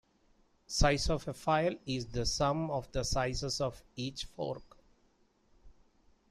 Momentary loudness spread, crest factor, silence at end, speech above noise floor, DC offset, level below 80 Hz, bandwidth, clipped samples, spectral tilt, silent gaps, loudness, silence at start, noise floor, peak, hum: 10 LU; 22 dB; 0.6 s; 37 dB; under 0.1%; -44 dBFS; 13.5 kHz; under 0.1%; -4.5 dB/octave; none; -34 LUFS; 0.7 s; -70 dBFS; -12 dBFS; none